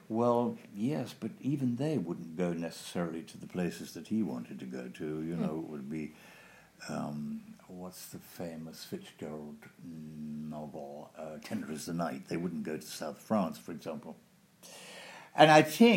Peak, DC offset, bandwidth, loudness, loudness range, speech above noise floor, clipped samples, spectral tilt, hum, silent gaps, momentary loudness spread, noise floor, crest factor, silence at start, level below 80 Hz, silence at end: -6 dBFS; under 0.1%; 16 kHz; -34 LUFS; 10 LU; 24 dB; under 0.1%; -5.5 dB/octave; none; none; 16 LU; -57 dBFS; 28 dB; 0.1 s; -72 dBFS; 0 s